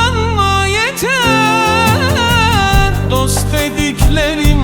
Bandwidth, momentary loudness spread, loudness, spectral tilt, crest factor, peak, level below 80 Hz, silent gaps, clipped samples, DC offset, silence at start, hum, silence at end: 19.5 kHz; 4 LU; -12 LUFS; -4.5 dB/octave; 12 dB; 0 dBFS; -20 dBFS; none; under 0.1%; under 0.1%; 0 s; none; 0 s